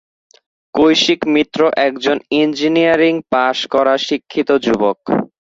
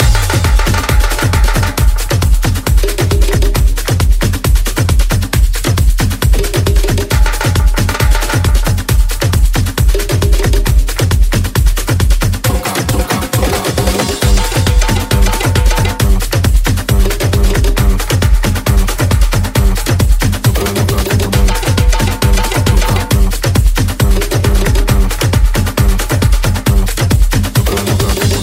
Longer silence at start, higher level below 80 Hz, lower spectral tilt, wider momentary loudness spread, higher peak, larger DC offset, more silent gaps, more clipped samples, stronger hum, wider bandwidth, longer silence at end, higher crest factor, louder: first, 0.75 s vs 0 s; second, -54 dBFS vs -12 dBFS; about the same, -4.5 dB/octave vs -5 dB/octave; first, 6 LU vs 2 LU; about the same, -2 dBFS vs 0 dBFS; neither; neither; neither; neither; second, 7.8 kHz vs 16.5 kHz; first, 0.25 s vs 0 s; about the same, 14 dB vs 10 dB; about the same, -15 LUFS vs -13 LUFS